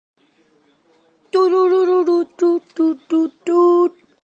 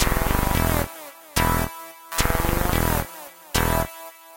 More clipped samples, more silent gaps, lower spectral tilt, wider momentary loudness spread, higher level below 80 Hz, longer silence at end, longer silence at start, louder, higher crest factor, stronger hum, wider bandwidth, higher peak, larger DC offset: neither; neither; about the same, -5 dB/octave vs -4 dB/octave; second, 6 LU vs 14 LU; second, -74 dBFS vs -30 dBFS; first, 0.35 s vs 0 s; first, 1.35 s vs 0 s; first, -16 LUFS vs -23 LUFS; second, 12 dB vs 18 dB; neither; second, 7.8 kHz vs 17 kHz; about the same, -4 dBFS vs -6 dBFS; neither